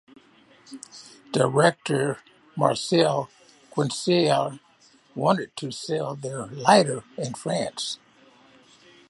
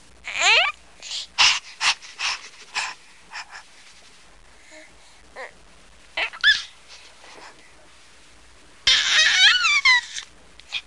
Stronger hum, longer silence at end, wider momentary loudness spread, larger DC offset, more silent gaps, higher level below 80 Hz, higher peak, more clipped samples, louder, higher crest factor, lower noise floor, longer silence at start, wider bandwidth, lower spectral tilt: neither; first, 1.15 s vs 0.05 s; second, 20 LU vs 25 LU; second, under 0.1% vs 0.3%; neither; second, -70 dBFS vs -56 dBFS; about the same, -2 dBFS vs -4 dBFS; neither; second, -24 LUFS vs -18 LUFS; about the same, 24 dB vs 22 dB; first, -58 dBFS vs -51 dBFS; first, 0.7 s vs 0.25 s; about the same, 11.5 kHz vs 11.5 kHz; first, -5 dB/octave vs 2.5 dB/octave